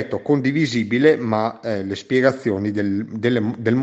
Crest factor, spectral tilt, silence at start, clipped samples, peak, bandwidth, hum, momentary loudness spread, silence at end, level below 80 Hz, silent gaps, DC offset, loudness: 18 dB; -7 dB/octave; 0 s; under 0.1%; 0 dBFS; 8.2 kHz; none; 7 LU; 0 s; -62 dBFS; none; under 0.1%; -20 LUFS